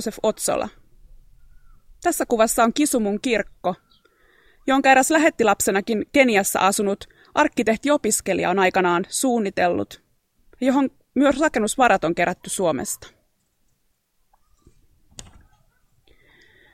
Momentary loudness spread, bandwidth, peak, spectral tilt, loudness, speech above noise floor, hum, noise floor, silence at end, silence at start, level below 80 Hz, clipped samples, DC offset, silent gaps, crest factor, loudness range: 10 LU; 16.5 kHz; -2 dBFS; -3.5 dB/octave; -20 LUFS; 47 dB; none; -67 dBFS; 1.5 s; 0 s; -52 dBFS; under 0.1%; under 0.1%; none; 20 dB; 5 LU